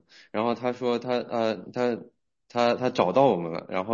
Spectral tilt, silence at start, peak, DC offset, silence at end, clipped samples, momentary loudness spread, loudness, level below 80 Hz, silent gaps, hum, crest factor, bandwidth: -6.5 dB/octave; 0.35 s; -8 dBFS; under 0.1%; 0 s; under 0.1%; 9 LU; -26 LUFS; -72 dBFS; none; none; 20 dB; 7.4 kHz